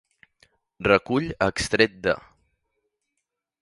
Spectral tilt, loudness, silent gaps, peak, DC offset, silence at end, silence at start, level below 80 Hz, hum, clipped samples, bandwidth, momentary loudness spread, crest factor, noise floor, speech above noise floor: -4.5 dB/octave; -23 LUFS; none; -2 dBFS; under 0.1%; 1.4 s; 0.8 s; -50 dBFS; none; under 0.1%; 11.5 kHz; 7 LU; 24 dB; -82 dBFS; 59 dB